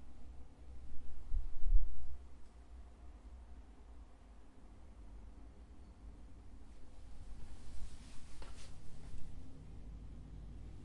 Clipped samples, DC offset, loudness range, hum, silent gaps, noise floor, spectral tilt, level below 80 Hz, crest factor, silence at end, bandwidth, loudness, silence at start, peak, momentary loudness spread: under 0.1%; under 0.1%; 11 LU; none; none; -56 dBFS; -6 dB/octave; -44 dBFS; 20 dB; 0 s; 9.2 kHz; -53 LUFS; 0 s; -16 dBFS; 12 LU